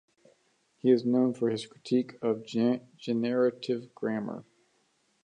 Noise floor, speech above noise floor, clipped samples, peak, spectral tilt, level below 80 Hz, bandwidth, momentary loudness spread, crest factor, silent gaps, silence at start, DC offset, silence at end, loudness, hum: -71 dBFS; 43 dB; under 0.1%; -12 dBFS; -7 dB/octave; -80 dBFS; 9.6 kHz; 9 LU; 18 dB; none; 0.85 s; under 0.1%; 0.8 s; -29 LUFS; none